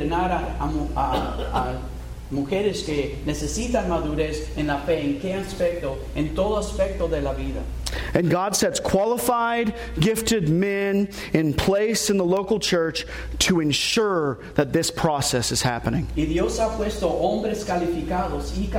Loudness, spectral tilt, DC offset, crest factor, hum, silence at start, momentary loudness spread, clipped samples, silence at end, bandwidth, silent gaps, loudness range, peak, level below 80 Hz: -23 LUFS; -4.5 dB/octave; under 0.1%; 18 dB; none; 0 s; 7 LU; under 0.1%; 0 s; 16.5 kHz; none; 4 LU; -6 dBFS; -34 dBFS